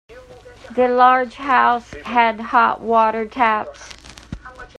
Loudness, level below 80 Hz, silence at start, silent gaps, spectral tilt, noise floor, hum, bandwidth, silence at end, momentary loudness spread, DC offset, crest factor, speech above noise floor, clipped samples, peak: -17 LUFS; -48 dBFS; 0.1 s; none; -4.5 dB/octave; -41 dBFS; none; 10 kHz; 0.15 s; 22 LU; under 0.1%; 18 dB; 25 dB; under 0.1%; 0 dBFS